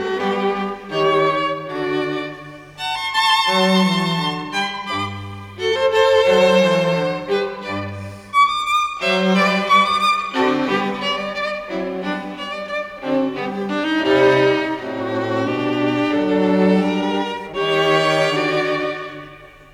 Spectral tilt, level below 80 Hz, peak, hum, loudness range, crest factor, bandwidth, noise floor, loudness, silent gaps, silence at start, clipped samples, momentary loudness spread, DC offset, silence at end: -5 dB/octave; -54 dBFS; -2 dBFS; none; 4 LU; 16 dB; 14.5 kHz; -40 dBFS; -18 LUFS; none; 0 s; under 0.1%; 12 LU; under 0.1%; 0.1 s